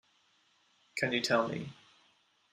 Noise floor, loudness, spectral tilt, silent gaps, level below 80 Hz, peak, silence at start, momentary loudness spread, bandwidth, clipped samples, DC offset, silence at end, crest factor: -71 dBFS; -32 LUFS; -4 dB/octave; none; -76 dBFS; -14 dBFS; 0.95 s; 14 LU; 13.5 kHz; under 0.1%; under 0.1%; 0.8 s; 22 dB